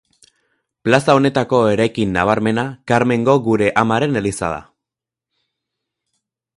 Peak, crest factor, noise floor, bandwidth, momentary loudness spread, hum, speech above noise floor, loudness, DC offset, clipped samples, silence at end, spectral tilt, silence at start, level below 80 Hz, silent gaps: 0 dBFS; 18 dB; -86 dBFS; 11.5 kHz; 8 LU; none; 70 dB; -16 LUFS; under 0.1%; under 0.1%; 1.95 s; -6 dB/octave; 0.85 s; -48 dBFS; none